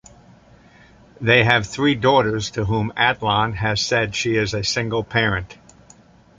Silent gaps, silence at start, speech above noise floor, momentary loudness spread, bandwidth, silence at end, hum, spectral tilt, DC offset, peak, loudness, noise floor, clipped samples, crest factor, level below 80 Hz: none; 1.2 s; 30 dB; 7 LU; 9.4 kHz; 0.85 s; none; -4.5 dB/octave; under 0.1%; 0 dBFS; -19 LUFS; -50 dBFS; under 0.1%; 20 dB; -44 dBFS